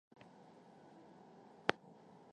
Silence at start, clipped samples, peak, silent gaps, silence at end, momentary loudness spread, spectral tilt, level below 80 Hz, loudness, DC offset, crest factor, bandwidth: 0.1 s; under 0.1%; -10 dBFS; none; 0 s; 22 LU; -4 dB/octave; -84 dBFS; -40 LUFS; under 0.1%; 38 dB; 10 kHz